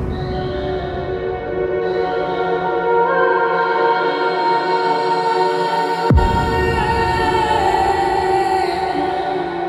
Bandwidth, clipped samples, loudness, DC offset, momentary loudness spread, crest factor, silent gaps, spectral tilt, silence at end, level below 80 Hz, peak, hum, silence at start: 15 kHz; under 0.1%; -17 LUFS; under 0.1%; 7 LU; 16 dB; none; -6.5 dB/octave; 0 s; -30 dBFS; -2 dBFS; none; 0 s